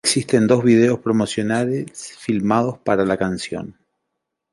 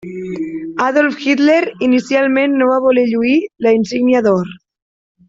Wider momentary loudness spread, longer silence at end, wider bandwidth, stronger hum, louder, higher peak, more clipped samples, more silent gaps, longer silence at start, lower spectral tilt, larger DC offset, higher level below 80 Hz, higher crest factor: first, 14 LU vs 11 LU; about the same, 0.8 s vs 0.7 s; first, 11.5 kHz vs 7.8 kHz; neither; second, -19 LUFS vs -14 LUFS; about the same, -2 dBFS vs -2 dBFS; neither; neither; about the same, 0.05 s vs 0.05 s; about the same, -5 dB/octave vs -6 dB/octave; neither; about the same, -54 dBFS vs -58 dBFS; first, 18 dB vs 12 dB